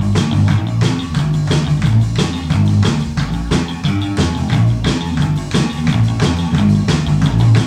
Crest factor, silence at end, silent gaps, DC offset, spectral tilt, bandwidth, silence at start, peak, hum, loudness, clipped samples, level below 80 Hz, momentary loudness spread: 14 dB; 0 s; none; under 0.1%; -6.5 dB/octave; 11 kHz; 0 s; 0 dBFS; none; -15 LUFS; under 0.1%; -28 dBFS; 4 LU